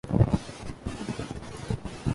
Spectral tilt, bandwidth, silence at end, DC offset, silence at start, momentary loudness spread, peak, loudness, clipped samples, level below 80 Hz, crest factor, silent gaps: -7 dB/octave; 11.5 kHz; 0 s; under 0.1%; 0.05 s; 14 LU; -6 dBFS; -31 LUFS; under 0.1%; -40 dBFS; 22 dB; none